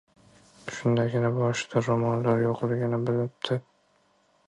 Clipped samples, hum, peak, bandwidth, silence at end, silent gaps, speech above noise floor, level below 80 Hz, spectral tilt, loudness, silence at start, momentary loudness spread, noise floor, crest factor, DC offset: under 0.1%; none; -12 dBFS; 10 kHz; 0.9 s; none; 41 dB; -64 dBFS; -6.5 dB/octave; -27 LUFS; 0.65 s; 6 LU; -66 dBFS; 16 dB; under 0.1%